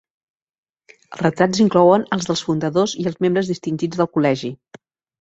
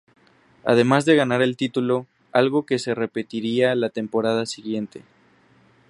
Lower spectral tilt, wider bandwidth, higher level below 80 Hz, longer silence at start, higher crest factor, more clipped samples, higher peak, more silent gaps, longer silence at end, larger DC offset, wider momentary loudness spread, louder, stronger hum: about the same, -5.5 dB/octave vs -5.5 dB/octave; second, 8.2 kHz vs 11.5 kHz; first, -58 dBFS vs -68 dBFS; first, 1.1 s vs 0.65 s; about the same, 18 dB vs 20 dB; neither; about the same, -2 dBFS vs -2 dBFS; neither; second, 0.65 s vs 0.9 s; neither; about the same, 9 LU vs 11 LU; first, -18 LUFS vs -22 LUFS; neither